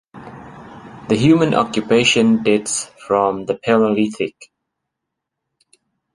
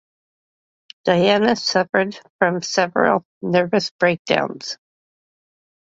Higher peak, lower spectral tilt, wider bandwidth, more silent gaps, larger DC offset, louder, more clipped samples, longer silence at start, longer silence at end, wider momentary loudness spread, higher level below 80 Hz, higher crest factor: about the same, -2 dBFS vs -2 dBFS; about the same, -4.5 dB/octave vs -4.5 dB/octave; first, 11.5 kHz vs 8 kHz; second, none vs 2.30-2.39 s, 3.25-3.41 s, 3.91-3.99 s, 4.19-4.25 s; neither; first, -16 LUFS vs -19 LUFS; neither; second, 0.15 s vs 1.05 s; first, 1.7 s vs 1.2 s; first, 24 LU vs 10 LU; first, -54 dBFS vs -62 dBFS; about the same, 18 dB vs 20 dB